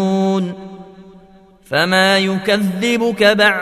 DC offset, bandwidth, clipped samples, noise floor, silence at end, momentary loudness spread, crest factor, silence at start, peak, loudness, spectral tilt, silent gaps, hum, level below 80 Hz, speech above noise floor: under 0.1%; 14 kHz; under 0.1%; -46 dBFS; 0 s; 11 LU; 16 dB; 0 s; 0 dBFS; -15 LUFS; -4.5 dB/octave; none; none; -54 dBFS; 31 dB